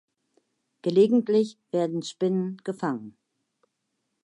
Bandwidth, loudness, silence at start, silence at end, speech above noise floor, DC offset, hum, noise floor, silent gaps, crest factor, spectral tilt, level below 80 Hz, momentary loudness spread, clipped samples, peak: 11 kHz; -26 LUFS; 0.85 s; 1.15 s; 54 dB; under 0.1%; none; -79 dBFS; none; 18 dB; -7 dB/octave; -80 dBFS; 11 LU; under 0.1%; -8 dBFS